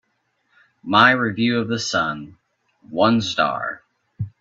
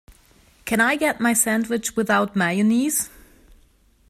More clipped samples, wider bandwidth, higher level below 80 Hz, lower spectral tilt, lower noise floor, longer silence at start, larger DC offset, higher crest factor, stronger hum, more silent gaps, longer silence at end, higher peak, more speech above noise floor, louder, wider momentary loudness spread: neither; second, 7.8 kHz vs 15.5 kHz; second, -60 dBFS vs -54 dBFS; about the same, -4.5 dB/octave vs -3.5 dB/octave; first, -69 dBFS vs -57 dBFS; first, 0.85 s vs 0.65 s; neither; about the same, 22 dB vs 18 dB; neither; neither; second, 0.1 s vs 1 s; first, 0 dBFS vs -4 dBFS; first, 50 dB vs 37 dB; about the same, -19 LUFS vs -20 LUFS; first, 19 LU vs 6 LU